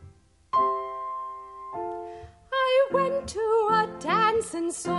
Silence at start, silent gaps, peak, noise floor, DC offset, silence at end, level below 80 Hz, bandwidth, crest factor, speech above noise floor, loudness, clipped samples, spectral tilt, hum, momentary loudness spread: 0 s; none; -10 dBFS; -53 dBFS; under 0.1%; 0 s; -56 dBFS; 11.5 kHz; 16 dB; 25 dB; -26 LUFS; under 0.1%; -4 dB/octave; none; 16 LU